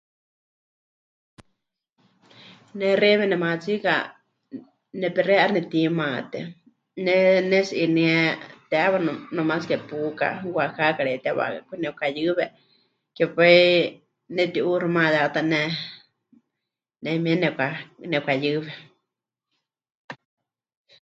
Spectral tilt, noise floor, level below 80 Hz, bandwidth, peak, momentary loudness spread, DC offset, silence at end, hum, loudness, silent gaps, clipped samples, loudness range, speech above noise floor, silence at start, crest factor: -6.5 dB/octave; -85 dBFS; -72 dBFS; 7.8 kHz; -4 dBFS; 18 LU; under 0.1%; 0.9 s; none; -22 LUFS; 19.95-20.09 s; under 0.1%; 6 LU; 63 dB; 2.5 s; 22 dB